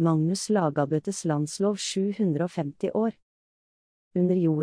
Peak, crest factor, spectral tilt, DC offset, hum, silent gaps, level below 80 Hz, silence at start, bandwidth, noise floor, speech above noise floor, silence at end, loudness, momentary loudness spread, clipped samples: -12 dBFS; 14 dB; -6 dB/octave; under 0.1%; none; 3.22-4.11 s; -70 dBFS; 0 s; 10.5 kHz; under -90 dBFS; over 65 dB; 0 s; -27 LUFS; 6 LU; under 0.1%